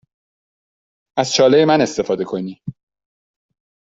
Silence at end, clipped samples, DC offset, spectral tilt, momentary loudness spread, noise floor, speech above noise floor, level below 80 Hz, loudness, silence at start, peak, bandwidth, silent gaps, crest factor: 1.2 s; under 0.1%; under 0.1%; -4.5 dB/octave; 18 LU; under -90 dBFS; over 74 dB; -60 dBFS; -16 LUFS; 1.15 s; -2 dBFS; 8 kHz; none; 18 dB